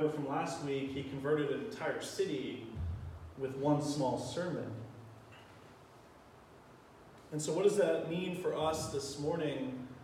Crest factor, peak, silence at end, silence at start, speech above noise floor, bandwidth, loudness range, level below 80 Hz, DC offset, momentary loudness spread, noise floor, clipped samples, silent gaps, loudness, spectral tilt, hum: 20 dB; -18 dBFS; 0 s; 0 s; 23 dB; 15.5 kHz; 7 LU; -60 dBFS; under 0.1%; 21 LU; -58 dBFS; under 0.1%; none; -36 LUFS; -5.5 dB/octave; none